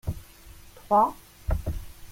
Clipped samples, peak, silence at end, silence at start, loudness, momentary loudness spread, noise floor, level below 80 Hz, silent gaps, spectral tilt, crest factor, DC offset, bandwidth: under 0.1%; -10 dBFS; 0 s; 0.05 s; -27 LUFS; 17 LU; -48 dBFS; -36 dBFS; none; -7 dB/octave; 18 dB; under 0.1%; 16.5 kHz